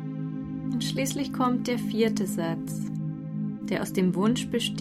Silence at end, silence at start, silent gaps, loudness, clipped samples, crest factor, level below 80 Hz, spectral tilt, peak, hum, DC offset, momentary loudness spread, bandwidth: 0 s; 0 s; none; -28 LUFS; under 0.1%; 16 dB; -58 dBFS; -5.5 dB/octave; -12 dBFS; none; under 0.1%; 8 LU; 15.5 kHz